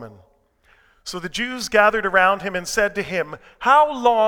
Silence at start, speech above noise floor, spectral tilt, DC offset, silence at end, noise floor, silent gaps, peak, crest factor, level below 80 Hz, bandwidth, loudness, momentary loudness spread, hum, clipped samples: 0 s; 39 dB; -3 dB/octave; under 0.1%; 0 s; -58 dBFS; none; 0 dBFS; 20 dB; -50 dBFS; 19 kHz; -19 LUFS; 15 LU; none; under 0.1%